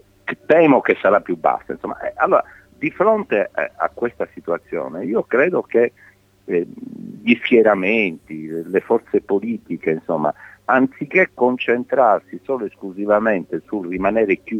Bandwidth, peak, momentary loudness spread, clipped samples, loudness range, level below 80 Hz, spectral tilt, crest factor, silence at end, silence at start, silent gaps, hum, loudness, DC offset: 6.4 kHz; -2 dBFS; 13 LU; under 0.1%; 3 LU; -58 dBFS; -7.5 dB/octave; 16 dB; 0 s; 0.25 s; none; none; -19 LUFS; under 0.1%